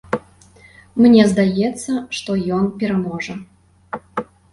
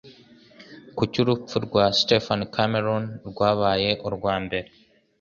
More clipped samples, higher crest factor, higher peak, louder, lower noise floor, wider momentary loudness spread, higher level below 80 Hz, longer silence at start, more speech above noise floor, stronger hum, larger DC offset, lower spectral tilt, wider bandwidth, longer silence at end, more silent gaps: neither; about the same, 16 dB vs 20 dB; about the same, -2 dBFS vs -4 dBFS; first, -18 LUFS vs -23 LUFS; about the same, -48 dBFS vs -51 dBFS; first, 17 LU vs 9 LU; about the same, -52 dBFS vs -52 dBFS; about the same, 0.1 s vs 0.05 s; about the same, 31 dB vs 28 dB; neither; neither; about the same, -6 dB/octave vs -5.5 dB/octave; first, 11.5 kHz vs 7.4 kHz; second, 0.3 s vs 0.55 s; neither